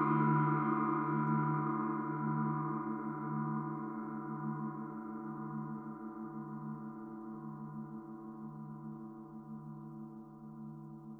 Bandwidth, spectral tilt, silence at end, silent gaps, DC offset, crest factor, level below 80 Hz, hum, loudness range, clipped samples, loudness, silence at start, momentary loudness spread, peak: 3.3 kHz; -11.5 dB/octave; 0 s; none; under 0.1%; 20 dB; -74 dBFS; 50 Hz at -45 dBFS; 13 LU; under 0.1%; -38 LUFS; 0 s; 16 LU; -18 dBFS